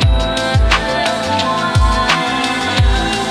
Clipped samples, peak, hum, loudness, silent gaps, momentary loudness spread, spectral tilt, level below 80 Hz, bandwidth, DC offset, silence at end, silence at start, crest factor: under 0.1%; 0 dBFS; none; -14 LUFS; none; 3 LU; -4.5 dB/octave; -18 dBFS; 13.5 kHz; under 0.1%; 0 s; 0 s; 14 dB